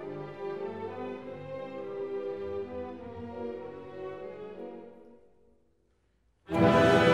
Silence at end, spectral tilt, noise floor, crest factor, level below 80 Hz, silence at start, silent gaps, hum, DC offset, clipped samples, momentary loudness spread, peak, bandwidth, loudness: 0 s; -6.5 dB/octave; -71 dBFS; 20 dB; -58 dBFS; 0 s; none; none; 0.1%; under 0.1%; 19 LU; -10 dBFS; 14.5 kHz; -32 LUFS